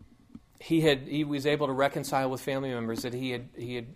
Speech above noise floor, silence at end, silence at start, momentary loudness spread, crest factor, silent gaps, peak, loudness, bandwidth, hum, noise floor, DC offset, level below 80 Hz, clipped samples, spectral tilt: 24 dB; 0 s; 0 s; 11 LU; 18 dB; none; -10 dBFS; -29 LUFS; 15.5 kHz; none; -53 dBFS; under 0.1%; -60 dBFS; under 0.1%; -5.5 dB/octave